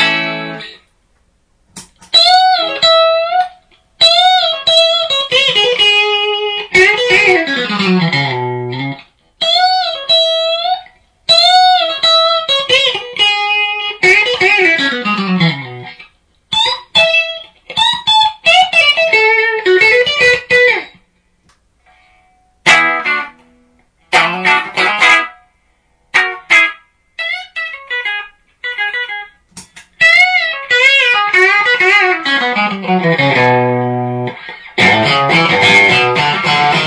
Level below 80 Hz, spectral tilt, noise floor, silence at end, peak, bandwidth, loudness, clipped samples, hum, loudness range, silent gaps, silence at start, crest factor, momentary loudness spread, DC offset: -52 dBFS; -3.5 dB/octave; -57 dBFS; 0 s; 0 dBFS; 11 kHz; -10 LUFS; under 0.1%; none; 5 LU; none; 0 s; 12 dB; 13 LU; under 0.1%